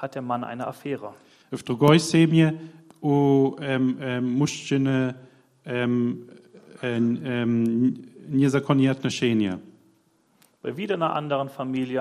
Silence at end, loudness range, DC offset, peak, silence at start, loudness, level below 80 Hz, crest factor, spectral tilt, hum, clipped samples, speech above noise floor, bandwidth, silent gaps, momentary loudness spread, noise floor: 0 s; 5 LU; under 0.1%; -4 dBFS; 0 s; -24 LUFS; -66 dBFS; 20 dB; -6.5 dB/octave; none; under 0.1%; 41 dB; 14.5 kHz; none; 15 LU; -64 dBFS